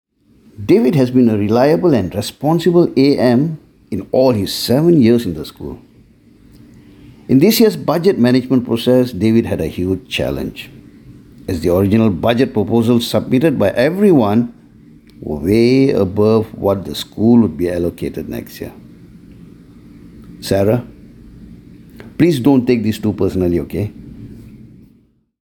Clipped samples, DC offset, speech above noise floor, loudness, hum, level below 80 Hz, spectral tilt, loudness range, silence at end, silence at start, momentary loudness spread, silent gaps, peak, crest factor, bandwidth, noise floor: under 0.1%; under 0.1%; 40 dB; -14 LUFS; none; -42 dBFS; -7 dB/octave; 6 LU; 0.8 s; 0.6 s; 15 LU; none; -2 dBFS; 14 dB; 17.5 kHz; -53 dBFS